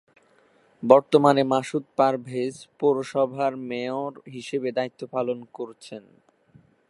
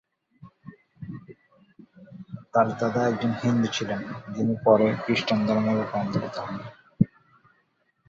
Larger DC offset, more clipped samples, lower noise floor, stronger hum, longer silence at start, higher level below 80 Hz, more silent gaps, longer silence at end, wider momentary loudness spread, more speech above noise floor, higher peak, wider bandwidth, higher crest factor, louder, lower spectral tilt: neither; neither; second, -60 dBFS vs -69 dBFS; neither; first, 0.8 s vs 0.4 s; second, -72 dBFS vs -60 dBFS; neither; about the same, 0.9 s vs 1 s; second, 18 LU vs 21 LU; second, 37 dB vs 45 dB; first, 0 dBFS vs -6 dBFS; first, 11.5 kHz vs 7.6 kHz; about the same, 24 dB vs 22 dB; about the same, -24 LUFS vs -25 LUFS; about the same, -6 dB/octave vs -6.5 dB/octave